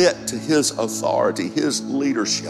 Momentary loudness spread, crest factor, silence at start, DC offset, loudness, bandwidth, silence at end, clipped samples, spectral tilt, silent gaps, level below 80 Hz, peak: 4 LU; 16 dB; 0 s; under 0.1%; -21 LUFS; 15 kHz; 0 s; under 0.1%; -3.5 dB/octave; none; -60 dBFS; -4 dBFS